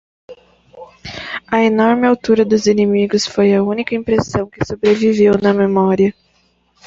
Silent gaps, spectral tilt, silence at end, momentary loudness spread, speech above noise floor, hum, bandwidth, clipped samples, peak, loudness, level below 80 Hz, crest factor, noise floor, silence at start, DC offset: none; -6 dB/octave; 0.75 s; 10 LU; 44 dB; none; 7.8 kHz; under 0.1%; -2 dBFS; -14 LUFS; -46 dBFS; 14 dB; -58 dBFS; 0.3 s; under 0.1%